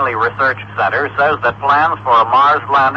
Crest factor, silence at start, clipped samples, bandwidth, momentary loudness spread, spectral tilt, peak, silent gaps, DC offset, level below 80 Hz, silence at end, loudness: 10 dB; 0 s; under 0.1%; 7.8 kHz; 5 LU; -6 dB/octave; -2 dBFS; none; under 0.1%; -50 dBFS; 0 s; -13 LUFS